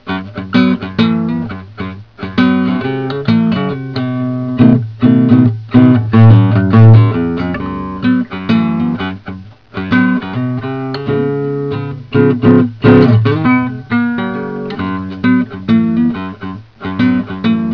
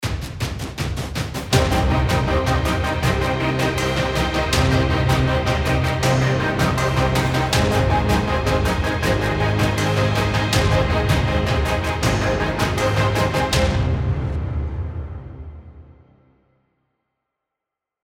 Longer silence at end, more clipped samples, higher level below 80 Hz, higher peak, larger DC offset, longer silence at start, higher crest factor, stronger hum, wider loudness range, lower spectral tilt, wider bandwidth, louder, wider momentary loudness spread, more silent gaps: second, 0 s vs 2.15 s; first, 0.6% vs under 0.1%; second, -42 dBFS vs -28 dBFS; first, 0 dBFS vs -4 dBFS; neither; about the same, 0.05 s vs 0 s; about the same, 12 dB vs 16 dB; neither; about the same, 7 LU vs 6 LU; first, -10 dB/octave vs -5.5 dB/octave; second, 5.4 kHz vs 17 kHz; first, -12 LUFS vs -20 LUFS; first, 14 LU vs 8 LU; neither